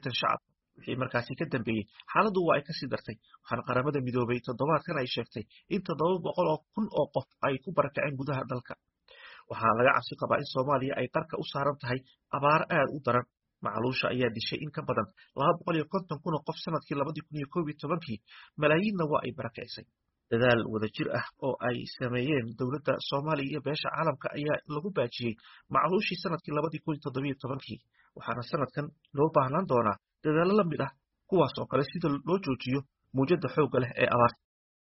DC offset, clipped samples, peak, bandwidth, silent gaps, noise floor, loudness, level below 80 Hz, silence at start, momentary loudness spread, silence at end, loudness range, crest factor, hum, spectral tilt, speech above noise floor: under 0.1%; under 0.1%; -10 dBFS; 5.8 kHz; none; -53 dBFS; -30 LUFS; -64 dBFS; 0.05 s; 11 LU; 0.65 s; 3 LU; 20 dB; none; -4.5 dB/octave; 23 dB